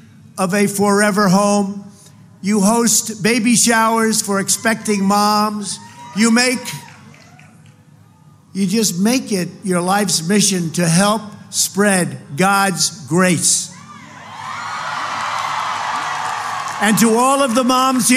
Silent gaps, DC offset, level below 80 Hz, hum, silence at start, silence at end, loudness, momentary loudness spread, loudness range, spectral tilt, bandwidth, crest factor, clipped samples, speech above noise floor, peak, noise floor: none; under 0.1%; -62 dBFS; none; 0.35 s; 0 s; -16 LUFS; 13 LU; 6 LU; -3.5 dB/octave; 16 kHz; 16 dB; under 0.1%; 31 dB; -2 dBFS; -47 dBFS